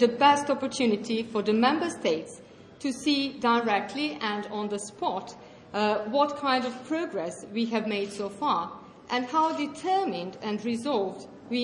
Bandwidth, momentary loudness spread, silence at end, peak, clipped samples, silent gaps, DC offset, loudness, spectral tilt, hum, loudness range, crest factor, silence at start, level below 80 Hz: 11.5 kHz; 10 LU; 0 s; -8 dBFS; under 0.1%; none; under 0.1%; -28 LUFS; -4 dB/octave; none; 2 LU; 20 dB; 0 s; -70 dBFS